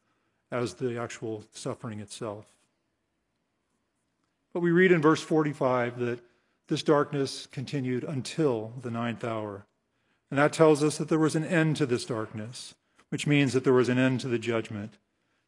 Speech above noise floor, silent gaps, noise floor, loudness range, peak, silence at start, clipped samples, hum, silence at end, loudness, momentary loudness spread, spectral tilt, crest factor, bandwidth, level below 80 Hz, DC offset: 51 dB; none; -78 dBFS; 10 LU; -6 dBFS; 0.5 s; under 0.1%; none; 0.6 s; -27 LUFS; 17 LU; -6 dB/octave; 22 dB; 11.5 kHz; -78 dBFS; under 0.1%